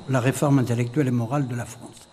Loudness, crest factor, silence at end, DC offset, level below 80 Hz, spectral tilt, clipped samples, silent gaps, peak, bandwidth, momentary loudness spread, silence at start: -23 LUFS; 16 dB; 0.1 s; under 0.1%; -58 dBFS; -7 dB/octave; under 0.1%; none; -6 dBFS; 15 kHz; 13 LU; 0 s